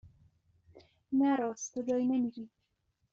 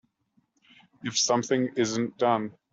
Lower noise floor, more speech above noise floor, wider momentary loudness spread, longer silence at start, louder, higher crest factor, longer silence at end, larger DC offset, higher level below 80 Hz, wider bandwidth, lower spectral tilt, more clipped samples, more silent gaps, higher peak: first, -79 dBFS vs -71 dBFS; about the same, 47 dB vs 45 dB; first, 13 LU vs 6 LU; second, 0.05 s vs 1.05 s; second, -32 LUFS vs -26 LUFS; about the same, 16 dB vs 20 dB; first, 0.65 s vs 0.2 s; neither; about the same, -74 dBFS vs -72 dBFS; about the same, 7.6 kHz vs 8 kHz; first, -5.5 dB/octave vs -3.5 dB/octave; neither; neither; second, -20 dBFS vs -10 dBFS